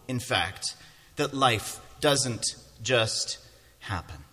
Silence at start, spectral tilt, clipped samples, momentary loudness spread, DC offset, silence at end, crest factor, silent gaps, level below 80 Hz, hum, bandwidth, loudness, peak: 0.1 s; -3 dB/octave; under 0.1%; 13 LU; under 0.1%; 0.1 s; 22 dB; none; -52 dBFS; none; 16 kHz; -28 LUFS; -8 dBFS